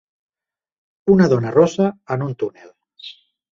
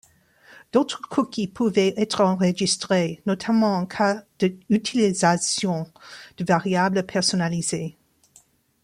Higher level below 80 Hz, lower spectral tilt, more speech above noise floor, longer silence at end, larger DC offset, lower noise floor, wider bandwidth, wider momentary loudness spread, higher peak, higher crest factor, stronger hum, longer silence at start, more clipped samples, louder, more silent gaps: first, -54 dBFS vs -62 dBFS; first, -7.5 dB/octave vs -4.5 dB/octave; first, over 73 dB vs 35 dB; second, 0.4 s vs 0.95 s; neither; first, under -90 dBFS vs -58 dBFS; second, 7.6 kHz vs 12 kHz; first, 23 LU vs 7 LU; first, -2 dBFS vs -6 dBFS; about the same, 18 dB vs 18 dB; neither; first, 1.05 s vs 0.75 s; neither; first, -18 LUFS vs -22 LUFS; neither